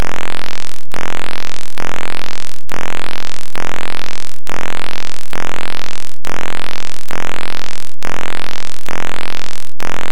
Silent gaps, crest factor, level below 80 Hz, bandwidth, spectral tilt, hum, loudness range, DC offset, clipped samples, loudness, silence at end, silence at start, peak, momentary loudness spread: none; 24 dB; -44 dBFS; 17 kHz; -3.5 dB/octave; none; 1 LU; 70%; under 0.1%; -26 LUFS; 0 s; 0 s; -2 dBFS; 4 LU